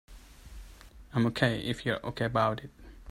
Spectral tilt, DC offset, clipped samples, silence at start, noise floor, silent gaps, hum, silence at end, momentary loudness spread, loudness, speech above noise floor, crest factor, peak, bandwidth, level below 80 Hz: -6.5 dB/octave; under 0.1%; under 0.1%; 0.1 s; -51 dBFS; none; none; 0 s; 23 LU; -30 LUFS; 21 dB; 24 dB; -10 dBFS; 14.5 kHz; -52 dBFS